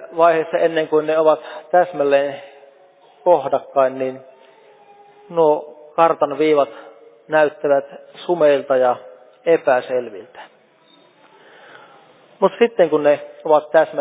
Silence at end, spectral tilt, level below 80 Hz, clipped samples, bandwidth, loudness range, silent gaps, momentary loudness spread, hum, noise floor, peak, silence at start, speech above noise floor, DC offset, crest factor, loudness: 0 s; -9 dB/octave; -76 dBFS; under 0.1%; 4 kHz; 4 LU; none; 11 LU; none; -52 dBFS; -2 dBFS; 0 s; 36 dB; under 0.1%; 18 dB; -18 LUFS